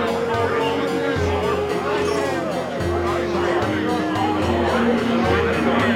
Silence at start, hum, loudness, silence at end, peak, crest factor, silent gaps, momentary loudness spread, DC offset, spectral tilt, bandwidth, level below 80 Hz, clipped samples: 0 s; none; -21 LUFS; 0 s; -6 dBFS; 14 dB; none; 3 LU; under 0.1%; -6 dB/octave; 16 kHz; -40 dBFS; under 0.1%